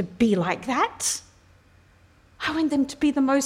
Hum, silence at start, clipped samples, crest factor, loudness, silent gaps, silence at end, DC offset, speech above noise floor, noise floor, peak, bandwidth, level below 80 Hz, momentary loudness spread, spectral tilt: none; 0 s; under 0.1%; 16 dB; -24 LUFS; none; 0 s; under 0.1%; 33 dB; -56 dBFS; -8 dBFS; 16 kHz; -56 dBFS; 6 LU; -4 dB/octave